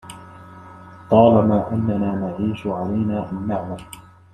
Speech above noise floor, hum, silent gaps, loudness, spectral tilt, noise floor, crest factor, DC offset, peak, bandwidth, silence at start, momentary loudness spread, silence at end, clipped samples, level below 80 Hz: 22 dB; none; none; -20 LUFS; -8.5 dB/octave; -41 dBFS; 20 dB; under 0.1%; -2 dBFS; 13 kHz; 0.05 s; 24 LU; 0.3 s; under 0.1%; -54 dBFS